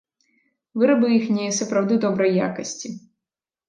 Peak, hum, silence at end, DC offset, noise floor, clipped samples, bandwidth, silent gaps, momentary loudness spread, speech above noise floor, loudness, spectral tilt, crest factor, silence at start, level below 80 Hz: -6 dBFS; none; 0.7 s; under 0.1%; -88 dBFS; under 0.1%; 9.6 kHz; none; 15 LU; 68 dB; -21 LUFS; -5 dB/octave; 16 dB; 0.75 s; -70 dBFS